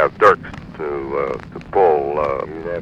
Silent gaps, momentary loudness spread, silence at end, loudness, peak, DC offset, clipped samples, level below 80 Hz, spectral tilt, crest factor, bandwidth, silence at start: none; 14 LU; 0 s; -19 LUFS; 0 dBFS; under 0.1%; under 0.1%; -44 dBFS; -7 dB/octave; 18 dB; 8.6 kHz; 0 s